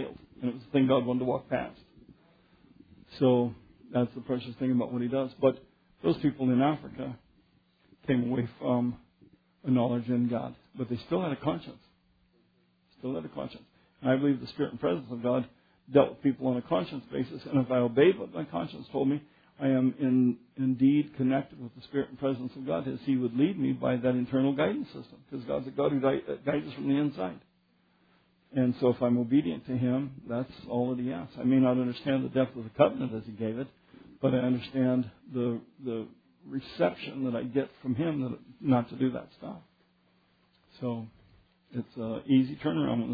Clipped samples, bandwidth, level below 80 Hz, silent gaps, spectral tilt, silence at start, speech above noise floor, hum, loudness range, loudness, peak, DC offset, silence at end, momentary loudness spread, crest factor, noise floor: under 0.1%; 5 kHz; -66 dBFS; none; -10.5 dB/octave; 0 s; 40 dB; none; 5 LU; -30 LUFS; -8 dBFS; under 0.1%; 0 s; 14 LU; 22 dB; -69 dBFS